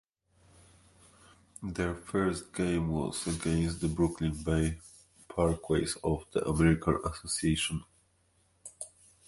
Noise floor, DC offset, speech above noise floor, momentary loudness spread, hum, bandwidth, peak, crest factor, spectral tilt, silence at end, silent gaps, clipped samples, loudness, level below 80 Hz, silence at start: -70 dBFS; under 0.1%; 39 dB; 16 LU; none; 11.5 kHz; -12 dBFS; 20 dB; -5.5 dB/octave; 0.4 s; none; under 0.1%; -31 LUFS; -46 dBFS; 1.6 s